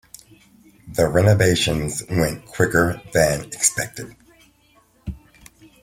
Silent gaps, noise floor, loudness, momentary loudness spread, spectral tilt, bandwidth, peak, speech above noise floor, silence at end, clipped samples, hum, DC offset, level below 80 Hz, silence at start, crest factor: none; -57 dBFS; -19 LUFS; 20 LU; -4 dB/octave; 16.5 kHz; -2 dBFS; 38 dB; 0.65 s; under 0.1%; none; under 0.1%; -42 dBFS; 0.85 s; 20 dB